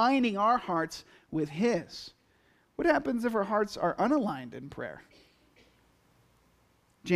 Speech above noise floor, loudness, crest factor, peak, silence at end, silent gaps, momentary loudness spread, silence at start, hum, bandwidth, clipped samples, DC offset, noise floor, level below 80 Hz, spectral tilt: 38 dB; -30 LUFS; 18 dB; -14 dBFS; 0 s; none; 18 LU; 0 s; none; 14.5 kHz; under 0.1%; under 0.1%; -67 dBFS; -64 dBFS; -6 dB/octave